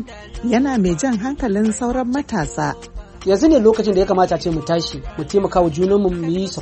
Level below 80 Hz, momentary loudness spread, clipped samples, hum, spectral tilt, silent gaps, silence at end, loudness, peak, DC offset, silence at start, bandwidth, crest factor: -36 dBFS; 12 LU; under 0.1%; none; -6 dB/octave; none; 0 s; -18 LUFS; -2 dBFS; under 0.1%; 0 s; 8.8 kHz; 16 dB